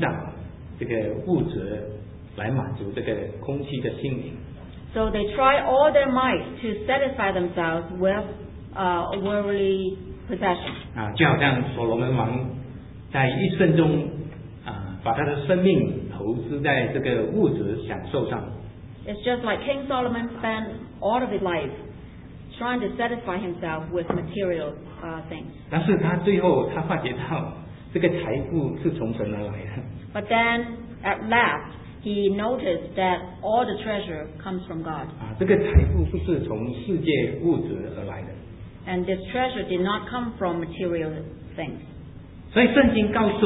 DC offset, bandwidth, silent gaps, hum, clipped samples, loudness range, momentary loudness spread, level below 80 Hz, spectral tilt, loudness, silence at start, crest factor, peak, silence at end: under 0.1%; 4 kHz; none; none; under 0.1%; 6 LU; 17 LU; -38 dBFS; -11 dB/octave; -25 LUFS; 0 s; 22 dB; -4 dBFS; 0 s